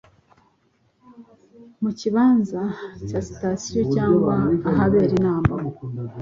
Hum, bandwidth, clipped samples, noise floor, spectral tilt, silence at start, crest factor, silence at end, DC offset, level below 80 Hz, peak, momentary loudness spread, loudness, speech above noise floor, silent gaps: none; 7.6 kHz; under 0.1%; -64 dBFS; -7.5 dB/octave; 1.2 s; 20 dB; 0 s; under 0.1%; -44 dBFS; -2 dBFS; 11 LU; -21 LUFS; 43 dB; none